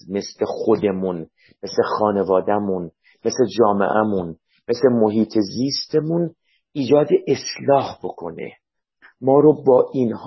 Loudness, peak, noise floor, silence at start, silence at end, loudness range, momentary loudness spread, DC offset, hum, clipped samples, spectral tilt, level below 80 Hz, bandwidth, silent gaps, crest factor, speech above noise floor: -19 LUFS; -2 dBFS; -54 dBFS; 0.05 s; 0 s; 2 LU; 15 LU; under 0.1%; none; under 0.1%; -6 dB/octave; -56 dBFS; 6.2 kHz; none; 16 dB; 35 dB